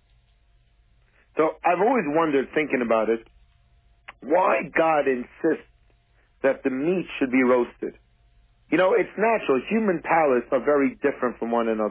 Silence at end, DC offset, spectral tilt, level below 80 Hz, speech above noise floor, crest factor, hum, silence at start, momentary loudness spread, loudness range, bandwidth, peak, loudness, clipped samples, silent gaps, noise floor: 0 s; under 0.1%; -10 dB/octave; -60 dBFS; 39 dB; 16 dB; none; 1.35 s; 6 LU; 3 LU; 4 kHz; -8 dBFS; -23 LUFS; under 0.1%; none; -61 dBFS